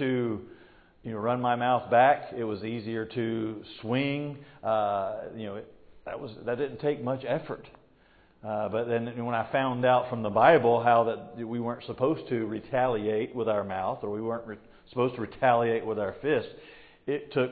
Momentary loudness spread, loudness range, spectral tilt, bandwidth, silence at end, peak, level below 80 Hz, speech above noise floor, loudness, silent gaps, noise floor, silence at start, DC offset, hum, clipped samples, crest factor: 17 LU; 7 LU; -10.5 dB/octave; 4.8 kHz; 0 s; -6 dBFS; -62 dBFS; 33 dB; -28 LUFS; none; -60 dBFS; 0 s; under 0.1%; none; under 0.1%; 22 dB